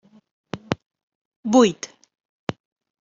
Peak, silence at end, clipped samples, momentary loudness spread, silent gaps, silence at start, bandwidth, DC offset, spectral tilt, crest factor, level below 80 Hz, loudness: -2 dBFS; 1.15 s; under 0.1%; 20 LU; 1.03-1.08 s, 1.15-1.43 s; 0.55 s; 7.6 kHz; under 0.1%; -5 dB/octave; 22 dB; -64 dBFS; -22 LUFS